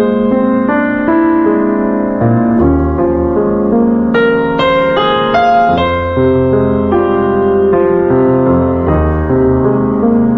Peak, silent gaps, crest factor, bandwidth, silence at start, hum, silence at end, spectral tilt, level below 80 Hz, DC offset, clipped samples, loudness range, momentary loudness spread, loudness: 0 dBFS; none; 10 dB; 6.2 kHz; 0 s; none; 0 s; -9 dB/octave; -26 dBFS; under 0.1%; under 0.1%; 1 LU; 3 LU; -11 LUFS